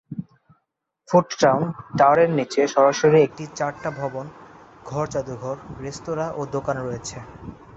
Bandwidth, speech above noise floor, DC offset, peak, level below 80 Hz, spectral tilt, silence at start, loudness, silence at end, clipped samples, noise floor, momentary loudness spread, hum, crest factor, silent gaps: 8.2 kHz; 55 dB; under 0.1%; -4 dBFS; -54 dBFS; -5.5 dB/octave; 0.1 s; -21 LUFS; 0.25 s; under 0.1%; -76 dBFS; 18 LU; none; 20 dB; none